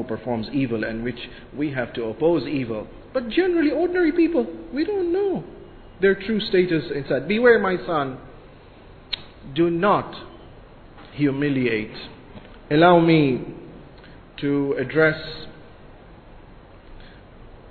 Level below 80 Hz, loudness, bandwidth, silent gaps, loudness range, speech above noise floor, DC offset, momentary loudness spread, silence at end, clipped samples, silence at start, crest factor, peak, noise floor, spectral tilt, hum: -48 dBFS; -22 LUFS; 4.6 kHz; none; 5 LU; 24 dB; under 0.1%; 19 LU; 0 s; under 0.1%; 0 s; 20 dB; -2 dBFS; -45 dBFS; -10 dB/octave; none